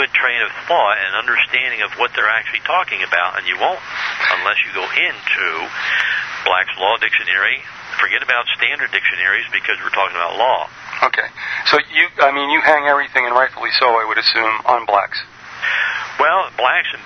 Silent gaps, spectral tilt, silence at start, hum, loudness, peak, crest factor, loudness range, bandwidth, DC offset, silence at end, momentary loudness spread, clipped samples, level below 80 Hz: none; -2 dB/octave; 0 s; none; -16 LUFS; 0 dBFS; 18 dB; 3 LU; 7.4 kHz; under 0.1%; 0 s; 5 LU; under 0.1%; -60 dBFS